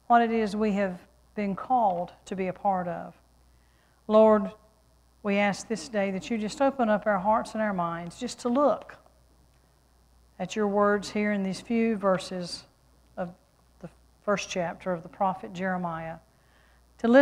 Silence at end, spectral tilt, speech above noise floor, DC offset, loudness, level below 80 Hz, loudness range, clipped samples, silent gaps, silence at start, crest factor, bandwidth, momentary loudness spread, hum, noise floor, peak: 0 s; -6 dB/octave; 35 dB; under 0.1%; -28 LUFS; -60 dBFS; 6 LU; under 0.1%; none; 0.1 s; 20 dB; 11.5 kHz; 15 LU; none; -62 dBFS; -8 dBFS